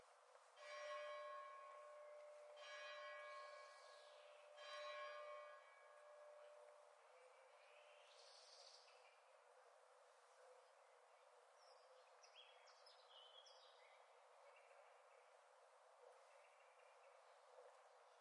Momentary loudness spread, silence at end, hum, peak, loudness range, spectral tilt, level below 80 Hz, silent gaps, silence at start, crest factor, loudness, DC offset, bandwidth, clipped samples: 15 LU; 0 s; none; -44 dBFS; 12 LU; 3 dB/octave; under -90 dBFS; none; 0 s; 20 dB; -61 LUFS; under 0.1%; 11 kHz; under 0.1%